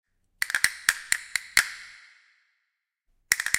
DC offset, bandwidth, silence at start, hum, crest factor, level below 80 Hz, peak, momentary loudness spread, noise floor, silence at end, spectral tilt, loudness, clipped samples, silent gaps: under 0.1%; 17 kHz; 0.4 s; none; 30 dB; -62 dBFS; 0 dBFS; 12 LU; -80 dBFS; 0 s; 2.5 dB/octave; -25 LUFS; under 0.1%; none